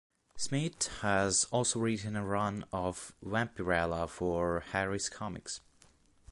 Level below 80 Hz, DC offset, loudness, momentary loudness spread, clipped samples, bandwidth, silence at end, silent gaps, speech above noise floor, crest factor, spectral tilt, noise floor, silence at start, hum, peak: -54 dBFS; under 0.1%; -33 LUFS; 11 LU; under 0.1%; 11.5 kHz; 0.7 s; none; 31 dB; 20 dB; -4 dB/octave; -64 dBFS; 0.35 s; none; -14 dBFS